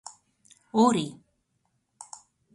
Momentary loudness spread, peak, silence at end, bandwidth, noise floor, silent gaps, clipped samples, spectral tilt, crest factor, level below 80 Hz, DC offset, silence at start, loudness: 24 LU; -10 dBFS; 1.4 s; 11.5 kHz; -75 dBFS; none; under 0.1%; -5 dB/octave; 20 dB; -72 dBFS; under 0.1%; 0.75 s; -25 LUFS